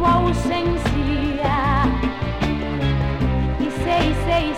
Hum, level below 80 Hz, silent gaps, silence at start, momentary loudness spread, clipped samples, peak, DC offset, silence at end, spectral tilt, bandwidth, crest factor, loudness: none; -26 dBFS; none; 0 s; 4 LU; under 0.1%; -6 dBFS; under 0.1%; 0 s; -7 dB/octave; 13 kHz; 14 dB; -21 LUFS